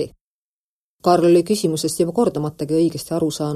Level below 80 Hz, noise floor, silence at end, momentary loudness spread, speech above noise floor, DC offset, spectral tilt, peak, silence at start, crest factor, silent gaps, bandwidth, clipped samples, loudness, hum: -54 dBFS; under -90 dBFS; 0 s; 8 LU; over 72 dB; under 0.1%; -6 dB/octave; -4 dBFS; 0 s; 16 dB; 0.21-0.99 s; 14 kHz; under 0.1%; -19 LUFS; none